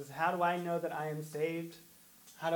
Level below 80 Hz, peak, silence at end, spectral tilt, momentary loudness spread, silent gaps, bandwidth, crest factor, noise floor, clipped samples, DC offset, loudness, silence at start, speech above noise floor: -80 dBFS; -18 dBFS; 0 s; -5.5 dB/octave; 23 LU; none; 19 kHz; 20 dB; -59 dBFS; under 0.1%; under 0.1%; -36 LUFS; 0 s; 24 dB